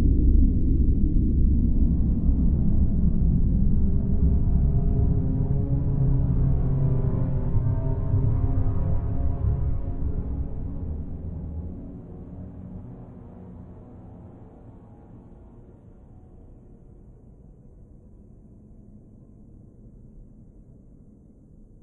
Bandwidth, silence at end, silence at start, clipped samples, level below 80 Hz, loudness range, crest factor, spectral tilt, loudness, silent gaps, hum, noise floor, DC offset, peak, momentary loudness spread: 1.9 kHz; 1.6 s; 0 s; under 0.1%; -26 dBFS; 20 LU; 16 dB; -14 dB/octave; -25 LUFS; none; none; -50 dBFS; under 0.1%; -8 dBFS; 20 LU